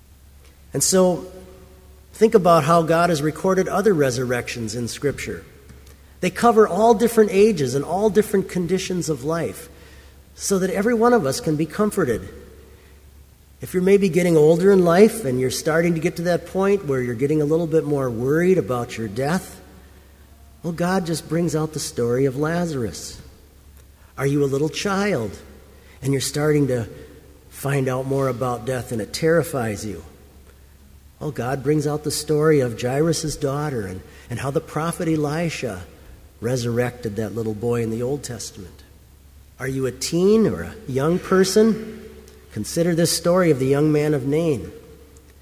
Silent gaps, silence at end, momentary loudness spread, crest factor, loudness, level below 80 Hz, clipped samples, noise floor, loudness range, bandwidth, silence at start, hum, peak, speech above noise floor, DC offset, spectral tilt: none; 0.5 s; 15 LU; 20 dB; -20 LUFS; -46 dBFS; under 0.1%; -48 dBFS; 7 LU; 16 kHz; 0.75 s; none; 0 dBFS; 28 dB; under 0.1%; -5.5 dB/octave